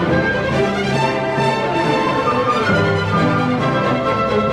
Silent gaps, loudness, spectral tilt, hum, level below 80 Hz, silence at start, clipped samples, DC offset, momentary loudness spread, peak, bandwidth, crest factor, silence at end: none; -17 LUFS; -6.5 dB/octave; none; -42 dBFS; 0 s; under 0.1%; 0.2%; 2 LU; -4 dBFS; 12.5 kHz; 12 dB; 0 s